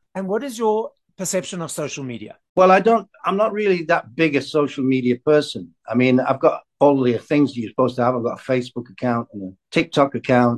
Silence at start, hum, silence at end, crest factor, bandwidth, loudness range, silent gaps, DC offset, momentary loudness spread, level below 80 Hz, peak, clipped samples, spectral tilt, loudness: 0.15 s; none; 0 s; 18 dB; 12.5 kHz; 2 LU; 2.49-2.55 s; under 0.1%; 11 LU; -62 dBFS; -2 dBFS; under 0.1%; -5.5 dB/octave; -20 LUFS